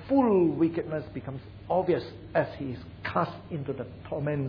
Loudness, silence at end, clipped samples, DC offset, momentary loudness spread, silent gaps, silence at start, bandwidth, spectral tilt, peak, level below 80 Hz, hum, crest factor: -29 LUFS; 0 s; under 0.1%; under 0.1%; 14 LU; none; 0 s; 5.2 kHz; -10 dB/octave; -12 dBFS; -54 dBFS; none; 16 dB